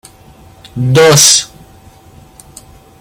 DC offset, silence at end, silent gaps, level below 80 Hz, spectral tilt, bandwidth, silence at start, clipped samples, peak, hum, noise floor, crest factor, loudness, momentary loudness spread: under 0.1%; 1.55 s; none; -44 dBFS; -2.5 dB/octave; over 20 kHz; 0.75 s; 0.2%; 0 dBFS; none; -40 dBFS; 14 dB; -7 LUFS; 24 LU